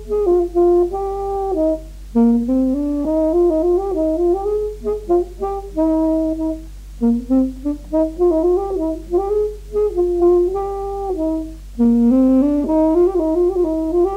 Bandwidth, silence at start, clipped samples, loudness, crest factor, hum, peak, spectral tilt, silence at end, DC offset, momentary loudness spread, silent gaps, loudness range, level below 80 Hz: 9.4 kHz; 0 s; under 0.1%; -18 LUFS; 12 dB; none; -6 dBFS; -9 dB/octave; 0 s; under 0.1%; 9 LU; none; 3 LU; -34 dBFS